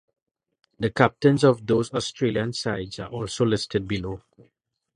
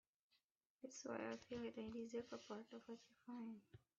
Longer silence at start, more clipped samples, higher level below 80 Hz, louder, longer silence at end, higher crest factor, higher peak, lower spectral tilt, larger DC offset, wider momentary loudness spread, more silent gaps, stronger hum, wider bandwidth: about the same, 0.8 s vs 0.8 s; neither; first, -52 dBFS vs -84 dBFS; first, -24 LUFS vs -53 LUFS; first, 0.8 s vs 0.2 s; first, 24 dB vs 18 dB; first, 0 dBFS vs -36 dBFS; first, -6 dB/octave vs -4.5 dB/octave; neither; first, 13 LU vs 10 LU; neither; neither; first, 11 kHz vs 7.4 kHz